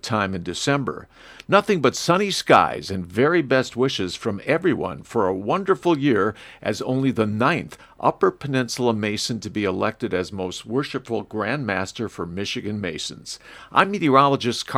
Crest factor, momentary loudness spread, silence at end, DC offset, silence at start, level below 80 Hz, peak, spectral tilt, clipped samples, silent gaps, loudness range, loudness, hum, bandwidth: 22 dB; 12 LU; 0 s; under 0.1%; 0.05 s; -56 dBFS; 0 dBFS; -5 dB/octave; under 0.1%; none; 6 LU; -22 LUFS; none; 15.5 kHz